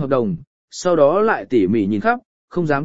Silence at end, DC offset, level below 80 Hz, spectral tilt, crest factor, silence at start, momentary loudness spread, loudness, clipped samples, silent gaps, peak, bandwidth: 0 s; 1%; -52 dBFS; -6.5 dB/octave; 16 dB; 0 s; 12 LU; -18 LUFS; under 0.1%; 0.47-0.68 s, 2.25-2.48 s; -2 dBFS; 8 kHz